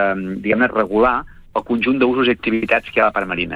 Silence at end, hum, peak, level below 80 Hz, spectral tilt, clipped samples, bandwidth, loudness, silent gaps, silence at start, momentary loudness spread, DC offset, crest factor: 0 s; none; -2 dBFS; -44 dBFS; -7 dB/octave; under 0.1%; 5.2 kHz; -17 LUFS; none; 0 s; 7 LU; under 0.1%; 16 dB